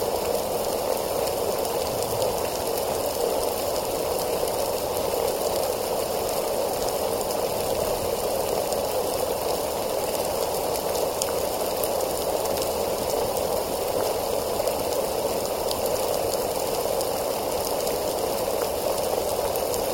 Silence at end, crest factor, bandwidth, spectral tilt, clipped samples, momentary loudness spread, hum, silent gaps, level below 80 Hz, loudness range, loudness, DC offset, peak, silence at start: 0 s; 20 dB; 17 kHz; -3 dB/octave; under 0.1%; 1 LU; none; none; -46 dBFS; 0 LU; -26 LUFS; under 0.1%; -4 dBFS; 0 s